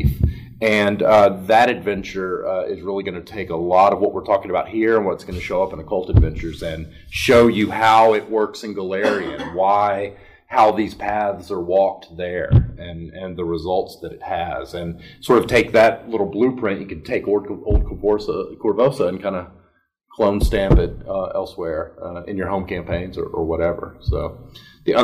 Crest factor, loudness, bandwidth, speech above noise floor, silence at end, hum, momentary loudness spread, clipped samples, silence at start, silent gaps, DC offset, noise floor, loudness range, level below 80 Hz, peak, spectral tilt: 16 dB; -19 LUFS; 15.5 kHz; 42 dB; 0 s; none; 14 LU; under 0.1%; 0 s; none; under 0.1%; -61 dBFS; 5 LU; -30 dBFS; -4 dBFS; -6.5 dB/octave